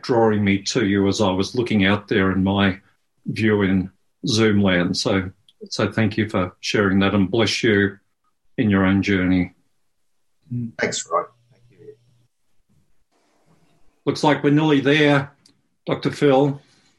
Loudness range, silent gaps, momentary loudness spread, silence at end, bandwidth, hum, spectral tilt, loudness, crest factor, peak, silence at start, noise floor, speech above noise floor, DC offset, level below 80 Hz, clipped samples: 10 LU; none; 13 LU; 0.4 s; 11.5 kHz; none; -5.5 dB/octave; -20 LUFS; 18 dB; -2 dBFS; 0.05 s; -75 dBFS; 56 dB; under 0.1%; -56 dBFS; under 0.1%